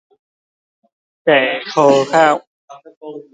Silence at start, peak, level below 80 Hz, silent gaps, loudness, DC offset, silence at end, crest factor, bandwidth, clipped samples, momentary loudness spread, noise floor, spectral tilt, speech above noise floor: 1.25 s; 0 dBFS; -68 dBFS; 2.47-2.68 s, 2.97-3.01 s; -14 LUFS; under 0.1%; 0.15 s; 16 dB; 9.4 kHz; under 0.1%; 22 LU; under -90 dBFS; -4.5 dB/octave; over 76 dB